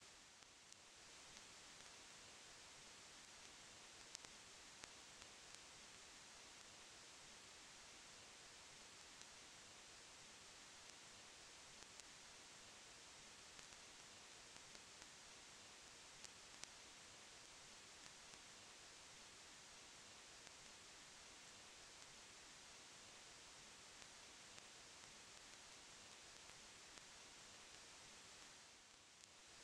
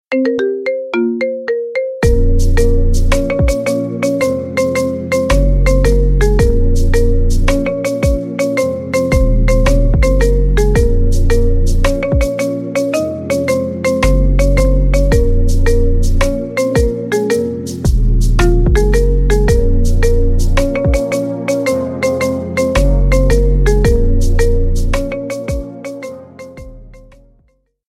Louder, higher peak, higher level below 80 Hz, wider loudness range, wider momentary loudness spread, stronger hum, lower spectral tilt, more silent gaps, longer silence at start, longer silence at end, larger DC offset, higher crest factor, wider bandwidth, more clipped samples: second, -60 LUFS vs -15 LUFS; second, -26 dBFS vs 0 dBFS; second, -82 dBFS vs -14 dBFS; about the same, 1 LU vs 2 LU; second, 1 LU vs 5 LU; neither; second, -0.5 dB/octave vs -6.5 dB/octave; neither; about the same, 0 s vs 0.1 s; second, 0 s vs 0.95 s; neither; first, 36 dB vs 10 dB; about the same, 13 kHz vs 14 kHz; neither